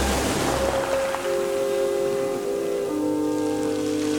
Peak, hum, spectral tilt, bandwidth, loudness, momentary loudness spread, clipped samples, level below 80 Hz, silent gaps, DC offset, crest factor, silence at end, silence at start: -8 dBFS; none; -4.5 dB/octave; 19.5 kHz; -24 LUFS; 3 LU; under 0.1%; -40 dBFS; none; under 0.1%; 16 dB; 0 s; 0 s